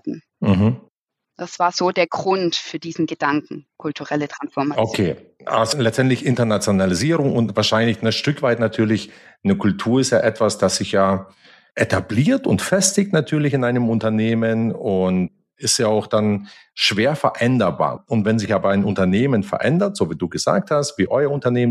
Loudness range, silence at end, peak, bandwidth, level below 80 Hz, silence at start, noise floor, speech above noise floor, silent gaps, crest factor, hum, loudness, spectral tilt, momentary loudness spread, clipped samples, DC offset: 3 LU; 0 s; -2 dBFS; 14 kHz; -56 dBFS; 0.05 s; -71 dBFS; 52 dB; 0.89-1.08 s; 16 dB; none; -19 LUFS; -5 dB/octave; 7 LU; under 0.1%; under 0.1%